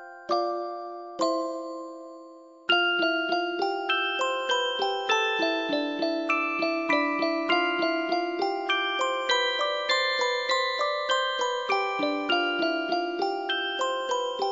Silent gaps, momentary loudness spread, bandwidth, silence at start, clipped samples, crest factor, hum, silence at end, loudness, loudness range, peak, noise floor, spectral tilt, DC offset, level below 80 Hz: none; 7 LU; 8 kHz; 0 s; under 0.1%; 16 dB; none; 0 s; -26 LUFS; 2 LU; -10 dBFS; -48 dBFS; -1.5 dB/octave; under 0.1%; -78 dBFS